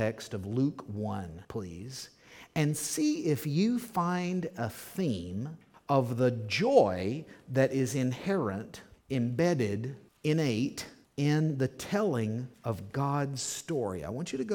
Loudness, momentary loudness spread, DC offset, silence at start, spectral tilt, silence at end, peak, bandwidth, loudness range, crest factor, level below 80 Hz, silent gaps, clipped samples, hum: -31 LUFS; 12 LU; under 0.1%; 0 s; -6 dB/octave; 0 s; -10 dBFS; 19 kHz; 3 LU; 22 dB; -64 dBFS; none; under 0.1%; none